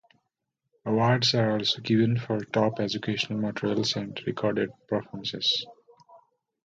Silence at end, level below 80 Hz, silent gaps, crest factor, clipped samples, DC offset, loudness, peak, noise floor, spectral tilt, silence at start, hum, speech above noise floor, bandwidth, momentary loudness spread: 0.5 s; -64 dBFS; none; 18 dB; under 0.1%; under 0.1%; -27 LUFS; -10 dBFS; -82 dBFS; -5.5 dB/octave; 0.85 s; none; 55 dB; 7.8 kHz; 9 LU